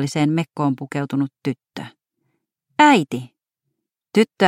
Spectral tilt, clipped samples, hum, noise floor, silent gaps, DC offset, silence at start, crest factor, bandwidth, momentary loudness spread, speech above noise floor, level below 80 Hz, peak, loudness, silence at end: -5.5 dB/octave; under 0.1%; none; -78 dBFS; none; under 0.1%; 0 s; 20 dB; 15 kHz; 18 LU; 59 dB; -68 dBFS; 0 dBFS; -20 LUFS; 0 s